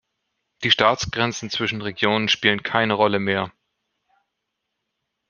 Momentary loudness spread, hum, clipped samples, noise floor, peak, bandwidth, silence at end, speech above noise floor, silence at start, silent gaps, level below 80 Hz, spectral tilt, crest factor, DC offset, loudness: 8 LU; none; under 0.1%; -79 dBFS; 0 dBFS; 7.2 kHz; 1.8 s; 58 dB; 0.6 s; none; -56 dBFS; -4 dB/octave; 24 dB; under 0.1%; -20 LUFS